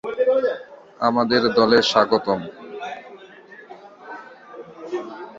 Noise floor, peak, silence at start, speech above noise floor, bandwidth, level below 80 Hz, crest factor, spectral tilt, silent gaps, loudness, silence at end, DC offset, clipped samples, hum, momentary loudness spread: -44 dBFS; -2 dBFS; 0.05 s; 26 dB; 7.8 kHz; -62 dBFS; 20 dB; -4.5 dB/octave; none; -19 LUFS; 0 s; under 0.1%; under 0.1%; none; 25 LU